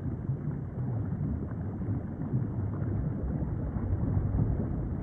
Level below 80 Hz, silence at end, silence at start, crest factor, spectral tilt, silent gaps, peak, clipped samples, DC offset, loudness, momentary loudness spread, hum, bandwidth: -40 dBFS; 0 s; 0 s; 16 dB; -13 dB/octave; none; -16 dBFS; under 0.1%; under 0.1%; -33 LUFS; 5 LU; none; 2.4 kHz